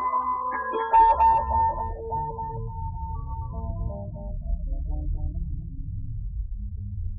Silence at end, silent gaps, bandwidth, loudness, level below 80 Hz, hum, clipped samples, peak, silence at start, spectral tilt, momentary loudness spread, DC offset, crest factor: 0 s; none; 4.8 kHz; -27 LUFS; -32 dBFS; none; under 0.1%; -10 dBFS; 0 s; -9.5 dB/octave; 17 LU; under 0.1%; 16 dB